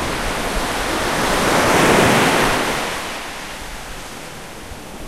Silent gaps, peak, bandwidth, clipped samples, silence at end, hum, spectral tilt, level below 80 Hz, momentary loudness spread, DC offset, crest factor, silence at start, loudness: none; -2 dBFS; 16 kHz; under 0.1%; 0 s; none; -3.5 dB/octave; -34 dBFS; 19 LU; 0.9%; 18 dB; 0 s; -17 LUFS